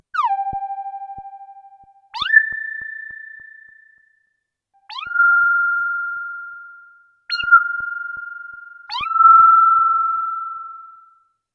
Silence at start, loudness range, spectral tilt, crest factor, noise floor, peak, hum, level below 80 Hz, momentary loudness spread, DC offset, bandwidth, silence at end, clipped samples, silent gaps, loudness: 0.15 s; 8 LU; -1 dB/octave; 18 dB; -72 dBFS; 0 dBFS; none; -60 dBFS; 24 LU; under 0.1%; 6 kHz; 0.65 s; under 0.1%; none; -16 LUFS